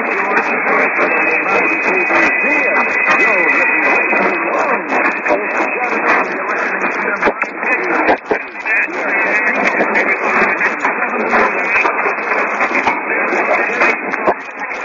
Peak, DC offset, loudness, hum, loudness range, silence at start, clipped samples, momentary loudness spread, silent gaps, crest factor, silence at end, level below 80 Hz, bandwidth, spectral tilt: -2 dBFS; under 0.1%; -13 LUFS; none; 4 LU; 0 s; under 0.1%; 5 LU; none; 12 dB; 0 s; -56 dBFS; 8 kHz; -4.5 dB/octave